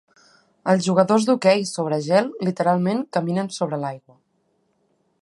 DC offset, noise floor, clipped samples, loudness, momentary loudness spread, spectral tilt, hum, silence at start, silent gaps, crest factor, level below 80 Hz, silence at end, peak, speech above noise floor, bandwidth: under 0.1%; -68 dBFS; under 0.1%; -21 LUFS; 9 LU; -6 dB/octave; none; 0.65 s; none; 20 dB; -70 dBFS; 1.25 s; -2 dBFS; 47 dB; 11.5 kHz